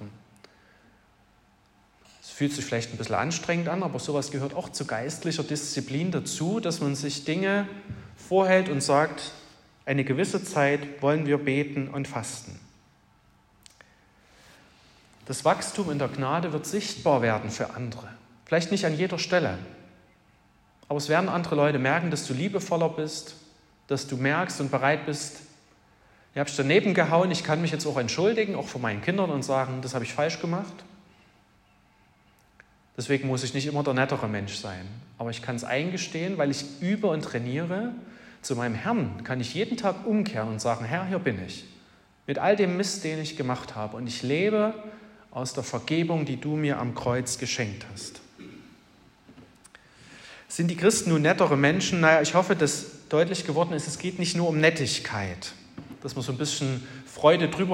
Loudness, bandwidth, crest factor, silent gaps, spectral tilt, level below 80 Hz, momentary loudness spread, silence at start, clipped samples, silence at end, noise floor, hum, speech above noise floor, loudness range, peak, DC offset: -27 LUFS; 16 kHz; 22 dB; none; -5 dB/octave; -64 dBFS; 15 LU; 0 s; under 0.1%; 0 s; -61 dBFS; none; 35 dB; 8 LU; -6 dBFS; under 0.1%